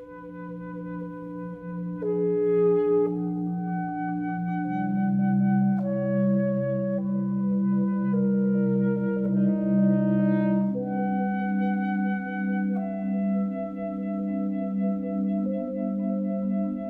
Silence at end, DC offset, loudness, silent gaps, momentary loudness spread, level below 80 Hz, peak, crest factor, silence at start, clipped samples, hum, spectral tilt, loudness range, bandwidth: 0 s; under 0.1%; -26 LUFS; none; 10 LU; -62 dBFS; -12 dBFS; 12 dB; 0 s; under 0.1%; none; -12 dB/octave; 4 LU; 3.2 kHz